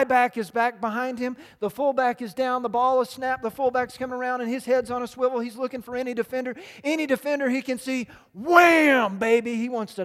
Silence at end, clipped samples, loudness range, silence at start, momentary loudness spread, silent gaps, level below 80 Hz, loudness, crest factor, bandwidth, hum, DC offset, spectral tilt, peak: 0 s; under 0.1%; 6 LU; 0 s; 12 LU; none; -64 dBFS; -24 LUFS; 24 dB; 15.5 kHz; none; under 0.1%; -4.5 dB/octave; 0 dBFS